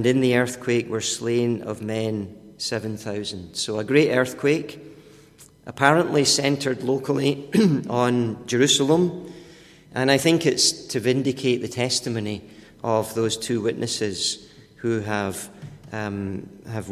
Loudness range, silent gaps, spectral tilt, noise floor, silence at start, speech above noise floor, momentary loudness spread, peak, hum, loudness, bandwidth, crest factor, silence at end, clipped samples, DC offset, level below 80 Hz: 5 LU; none; -4 dB/octave; -50 dBFS; 0 s; 28 dB; 15 LU; 0 dBFS; none; -22 LUFS; 15.5 kHz; 22 dB; 0 s; under 0.1%; under 0.1%; -56 dBFS